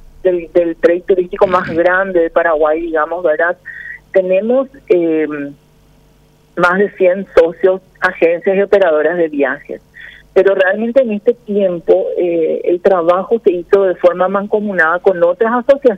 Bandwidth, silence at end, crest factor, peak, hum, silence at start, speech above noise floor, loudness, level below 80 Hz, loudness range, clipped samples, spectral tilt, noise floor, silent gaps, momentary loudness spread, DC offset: 7.4 kHz; 0 s; 12 dB; 0 dBFS; none; 0.25 s; 36 dB; -13 LUFS; -46 dBFS; 3 LU; under 0.1%; -7.5 dB/octave; -49 dBFS; none; 5 LU; under 0.1%